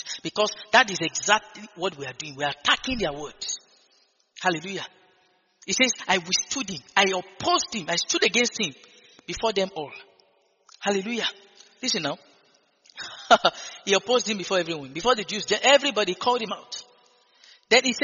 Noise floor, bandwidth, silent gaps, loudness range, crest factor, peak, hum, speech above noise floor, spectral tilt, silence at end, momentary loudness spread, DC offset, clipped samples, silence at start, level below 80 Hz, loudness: -64 dBFS; 7.4 kHz; none; 7 LU; 24 dB; -2 dBFS; none; 40 dB; -0.5 dB/octave; 0 s; 15 LU; under 0.1%; under 0.1%; 0 s; -58 dBFS; -24 LUFS